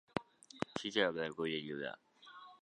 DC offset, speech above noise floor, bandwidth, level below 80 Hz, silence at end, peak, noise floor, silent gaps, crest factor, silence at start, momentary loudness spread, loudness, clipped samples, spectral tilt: under 0.1%; 20 dB; 11 kHz; -74 dBFS; 0.05 s; -16 dBFS; -58 dBFS; none; 26 dB; 0.15 s; 21 LU; -39 LUFS; under 0.1%; -4.5 dB/octave